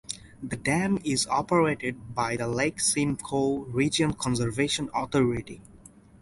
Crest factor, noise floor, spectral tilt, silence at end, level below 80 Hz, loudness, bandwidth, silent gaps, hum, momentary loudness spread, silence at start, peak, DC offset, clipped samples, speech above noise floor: 18 dB; -52 dBFS; -4.5 dB/octave; 0.45 s; -52 dBFS; -27 LUFS; 11.5 kHz; none; none; 9 LU; 0.1 s; -10 dBFS; under 0.1%; under 0.1%; 25 dB